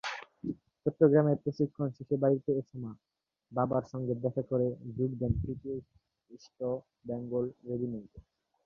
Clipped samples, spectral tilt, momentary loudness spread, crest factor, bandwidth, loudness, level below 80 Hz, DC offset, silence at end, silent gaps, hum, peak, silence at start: under 0.1%; -9 dB/octave; 14 LU; 22 dB; 7.2 kHz; -33 LUFS; -54 dBFS; under 0.1%; 0.45 s; none; none; -10 dBFS; 0.05 s